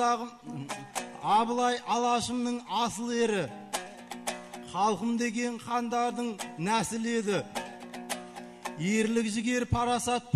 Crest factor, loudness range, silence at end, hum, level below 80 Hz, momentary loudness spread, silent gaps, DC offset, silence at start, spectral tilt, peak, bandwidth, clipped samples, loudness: 18 dB; 3 LU; 0 s; none; -56 dBFS; 11 LU; none; under 0.1%; 0 s; -4 dB/octave; -12 dBFS; 13 kHz; under 0.1%; -30 LUFS